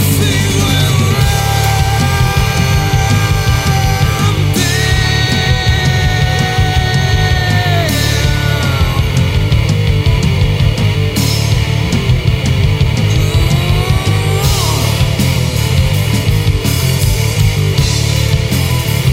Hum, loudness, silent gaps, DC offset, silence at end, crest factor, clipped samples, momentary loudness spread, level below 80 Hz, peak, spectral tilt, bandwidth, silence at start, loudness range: none; -12 LUFS; none; under 0.1%; 0 s; 10 dB; under 0.1%; 1 LU; -20 dBFS; 0 dBFS; -5 dB/octave; 16.5 kHz; 0 s; 1 LU